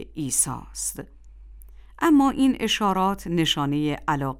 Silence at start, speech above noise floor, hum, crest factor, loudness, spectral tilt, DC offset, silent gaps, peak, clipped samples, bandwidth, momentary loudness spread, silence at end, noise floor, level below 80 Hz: 0 s; 21 dB; none; 16 dB; -23 LUFS; -3.5 dB/octave; under 0.1%; none; -8 dBFS; under 0.1%; 17 kHz; 11 LU; 0 s; -44 dBFS; -46 dBFS